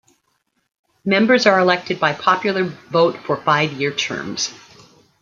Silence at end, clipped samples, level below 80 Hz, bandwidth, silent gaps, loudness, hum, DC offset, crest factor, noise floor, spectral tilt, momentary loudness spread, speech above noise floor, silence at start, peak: 0.65 s; under 0.1%; -64 dBFS; 7.6 kHz; none; -18 LUFS; none; under 0.1%; 18 dB; -68 dBFS; -4 dB/octave; 10 LU; 51 dB; 1.05 s; -2 dBFS